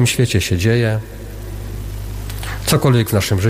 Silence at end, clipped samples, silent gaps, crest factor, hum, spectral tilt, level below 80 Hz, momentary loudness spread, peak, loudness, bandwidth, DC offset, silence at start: 0 s; under 0.1%; none; 14 dB; none; -5 dB/octave; -32 dBFS; 16 LU; -2 dBFS; -17 LUFS; 16 kHz; under 0.1%; 0 s